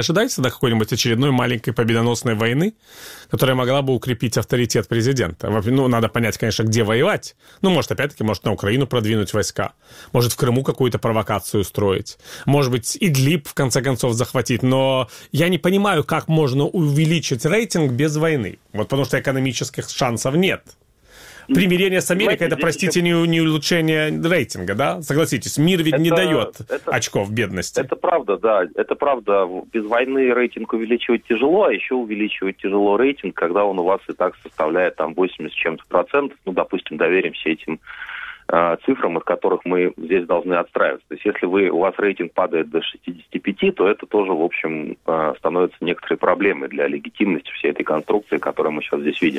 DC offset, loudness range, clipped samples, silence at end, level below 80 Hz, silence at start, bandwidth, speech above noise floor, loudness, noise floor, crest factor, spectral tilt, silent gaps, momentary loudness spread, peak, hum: under 0.1%; 3 LU; under 0.1%; 0 s; -52 dBFS; 0 s; 16.5 kHz; 27 dB; -19 LUFS; -46 dBFS; 18 dB; -5.5 dB/octave; none; 7 LU; -2 dBFS; none